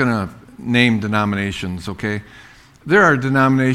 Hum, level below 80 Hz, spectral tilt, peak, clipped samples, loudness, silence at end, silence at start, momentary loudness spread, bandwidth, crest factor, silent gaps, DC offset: none; -46 dBFS; -6.5 dB/octave; 0 dBFS; under 0.1%; -17 LUFS; 0 s; 0 s; 15 LU; 13 kHz; 18 dB; none; under 0.1%